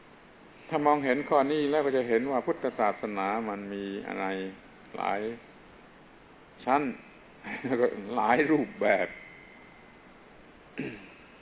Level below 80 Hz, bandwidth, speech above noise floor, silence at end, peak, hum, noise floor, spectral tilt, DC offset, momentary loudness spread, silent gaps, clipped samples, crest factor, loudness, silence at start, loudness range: -66 dBFS; 4 kHz; 26 dB; 0.05 s; -10 dBFS; none; -54 dBFS; -4 dB/octave; under 0.1%; 20 LU; none; under 0.1%; 20 dB; -29 LUFS; 0.55 s; 7 LU